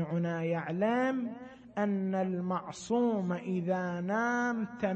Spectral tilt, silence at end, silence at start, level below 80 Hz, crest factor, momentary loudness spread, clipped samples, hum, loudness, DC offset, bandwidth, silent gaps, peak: -7 dB/octave; 0 s; 0 s; -70 dBFS; 14 dB; 6 LU; under 0.1%; none; -32 LUFS; under 0.1%; 8.6 kHz; none; -18 dBFS